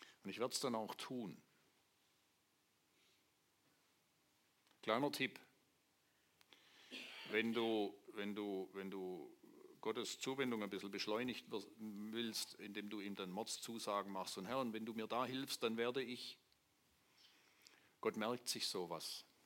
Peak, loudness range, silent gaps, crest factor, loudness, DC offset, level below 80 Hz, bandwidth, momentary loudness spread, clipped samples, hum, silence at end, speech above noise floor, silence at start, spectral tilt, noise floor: -24 dBFS; 4 LU; none; 24 dB; -45 LUFS; under 0.1%; under -90 dBFS; 16.5 kHz; 11 LU; under 0.1%; none; 0.2 s; 36 dB; 0 s; -3.5 dB/octave; -80 dBFS